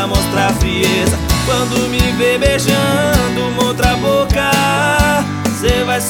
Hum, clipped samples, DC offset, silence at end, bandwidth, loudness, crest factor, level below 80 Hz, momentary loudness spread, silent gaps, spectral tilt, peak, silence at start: none; under 0.1%; under 0.1%; 0 s; over 20 kHz; -14 LUFS; 14 dB; -24 dBFS; 3 LU; none; -4.5 dB/octave; 0 dBFS; 0 s